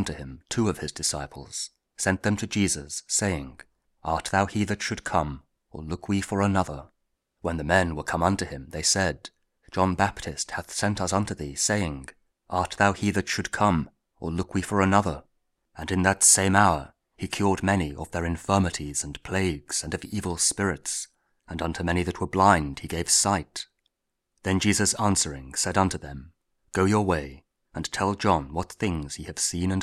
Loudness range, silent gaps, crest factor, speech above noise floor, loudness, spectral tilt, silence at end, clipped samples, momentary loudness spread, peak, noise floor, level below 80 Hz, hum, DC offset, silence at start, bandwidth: 5 LU; none; 24 dB; 55 dB; -25 LUFS; -4 dB/octave; 0 s; under 0.1%; 14 LU; -2 dBFS; -81 dBFS; -46 dBFS; none; under 0.1%; 0 s; 15.5 kHz